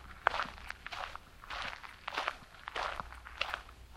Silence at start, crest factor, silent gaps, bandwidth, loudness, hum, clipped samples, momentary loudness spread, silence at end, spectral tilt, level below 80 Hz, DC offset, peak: 0 s; 32 dB; none; 16 kHz; -40 LUFS; none; under 0.1%; 11 LU; 0 s; -2.5 dB/octave; -56 dBFS; under 0.1%; -8 dBFS